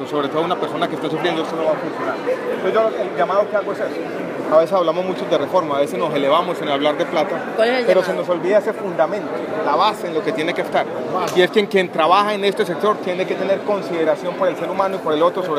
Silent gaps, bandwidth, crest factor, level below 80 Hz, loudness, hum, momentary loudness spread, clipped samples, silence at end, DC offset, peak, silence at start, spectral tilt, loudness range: none; 15.5 kHz; 18 dB; -70 dBFS; -19 LUFS; none; 6 LU; under 0.1%; 0 s; under 0.1%; 0 dBFS; 0 s; -5.5 dB/octave; 2 LU